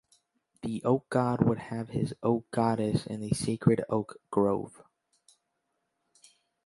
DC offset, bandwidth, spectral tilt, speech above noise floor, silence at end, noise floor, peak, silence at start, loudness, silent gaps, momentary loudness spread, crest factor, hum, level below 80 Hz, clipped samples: under 0.1%; 11.5 kHz; -7 dB/octave; 52 dB; 1.95 s; -80 dBFS; -8 dBFS; 0.65 s; -30 LUFS; none; 8 LU; 22 dB; none; -60 dBFS; under 0.1%